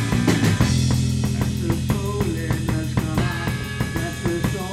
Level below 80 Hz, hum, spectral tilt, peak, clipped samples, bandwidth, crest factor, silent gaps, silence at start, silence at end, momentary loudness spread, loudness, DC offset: -34 dBFS; none; -5.5 dB/octave; -4 dBFS; under 0.1%; 15.5 kHz; 18 dB; none; 0 s; 0 s; 6 LU; -22 LUFS; under 0.1%